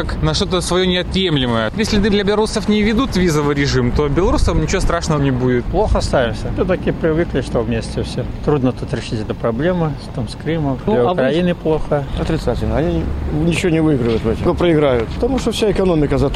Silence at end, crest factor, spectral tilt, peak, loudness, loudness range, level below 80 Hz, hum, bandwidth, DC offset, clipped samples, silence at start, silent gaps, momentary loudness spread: 0 s; 12 dB; -6 dB/octave; -4 dBFS; -17 LUFS; 3 LU; -26 dBFS; none; 13.5 kHz; under 0.1%; under 0.1%; 0 s; none; 6 LU